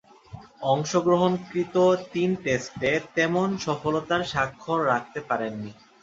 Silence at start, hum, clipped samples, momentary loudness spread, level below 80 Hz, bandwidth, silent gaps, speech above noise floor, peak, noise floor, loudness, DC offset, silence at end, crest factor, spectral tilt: 0.3 s; none; under 0.1%; 7 LU; -58 dBFS; 7.8 kHz; none; 21 dB; -8 dBFS; -45 dBFS; -25 LUFS; under 0.1%; 0.3 s; 18 dB; -5.5 dB/octave